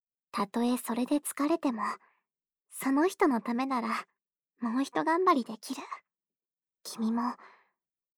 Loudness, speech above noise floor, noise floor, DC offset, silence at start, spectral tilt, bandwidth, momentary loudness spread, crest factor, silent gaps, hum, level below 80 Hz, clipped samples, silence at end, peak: -31 LUFS; over 60 dB; under -90 dBFS; under 0.1%; 0.35 s; -4 dB/octave; 20 kHz; 16 LU; 18 dB; none; none; -80 dBFS; under 0.1%; 0.7 s; -14 dBFS